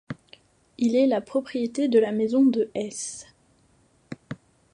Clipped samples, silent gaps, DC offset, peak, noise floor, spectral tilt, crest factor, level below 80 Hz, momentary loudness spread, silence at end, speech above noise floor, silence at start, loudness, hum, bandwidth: under 0.1%; none; under 0.1%; -8 dBFS; -62 dBFS; -5 dB/octave; 18 dB; -68 dBFS; 21 LU; 0.4 s; 39 dB; 0.1 s; -24 LUFS; none; 11 kHz